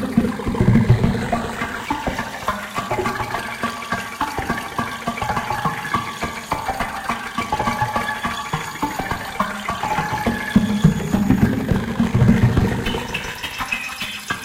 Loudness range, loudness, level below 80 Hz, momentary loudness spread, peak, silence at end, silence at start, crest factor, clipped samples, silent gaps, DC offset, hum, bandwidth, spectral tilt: 6 LU; -21 LUFS; -34 dBFS; 9 LU; 0 dBFS; 0 s; 0 s; 20 dB; under 0.1%; none; under 0.1%; none; 16.5 kHz; -6 dB/octave